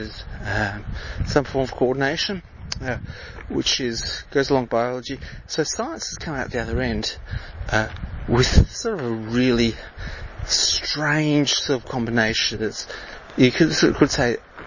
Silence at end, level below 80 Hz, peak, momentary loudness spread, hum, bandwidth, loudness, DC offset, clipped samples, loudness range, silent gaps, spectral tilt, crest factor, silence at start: 0 s; -34 dBFS; 0 dBFS; 15 LU; none; 7.4 kHz; -22 LUFS; under 0.1%; under 0.1%; 5 LU; none; -4 dB/octave; 22 dB; 0 s